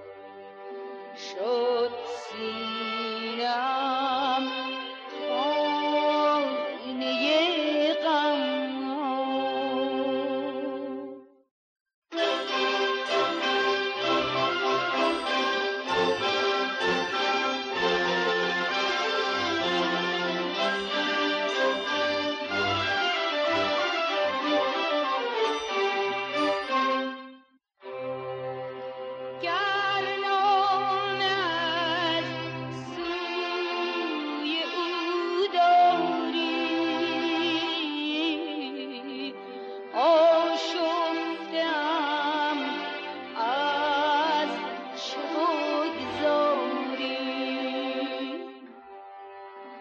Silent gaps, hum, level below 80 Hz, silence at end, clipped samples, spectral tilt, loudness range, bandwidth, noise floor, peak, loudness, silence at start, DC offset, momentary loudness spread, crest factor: 11.51-11.86 s, 11.94-12.02 s; none; -70 dBFS; 0 s; under 0.1%; -4 dB/octave; 5 LU; 8.8 kHz; -57 dBFS; -12 dBFS; -27 LUFS; 0 s; under 0.1%; 11 LU; 14 dB